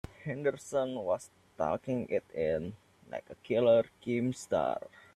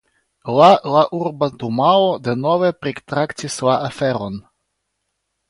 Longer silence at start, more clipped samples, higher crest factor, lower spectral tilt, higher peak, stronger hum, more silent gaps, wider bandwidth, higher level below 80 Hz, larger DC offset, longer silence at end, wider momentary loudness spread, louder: second, 0.2 s vs 0.45 s; neither; about the same, 18 dB vs 18 dB; about the same, -6 dB/octave vs -5.5 dB/octave; second, -14 dBFS vs 0 dBFS; neither; neither; about the same, 12.5 kHz vs 11.5 kHz; second, -64 dBFS vs -58 dBFS; neither; second, 0.35 s vs 1.1 s; first, 17 LU vs 13 LU; second, -32 LUFS vs -17 LUFS